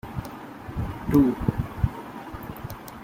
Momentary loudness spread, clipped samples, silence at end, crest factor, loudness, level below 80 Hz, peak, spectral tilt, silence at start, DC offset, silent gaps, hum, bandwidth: 17 LU; under 0.1%; 0 s; 20 dB; -26 LUFS; -40 dBFS; -8 dBFS; -8.5 dB/octave; 0.05 s; under 0.1%; none; none; 16.5 kHz